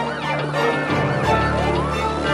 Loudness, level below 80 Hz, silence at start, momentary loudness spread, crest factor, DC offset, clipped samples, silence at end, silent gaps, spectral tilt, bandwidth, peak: -20 LUFS; -34 dBFS; 0 s; 4 LU; 14 dB; under 0.1%; under 0.1%; 0 s; none; -6 dB/octave; 14 kHz; -6 dBFS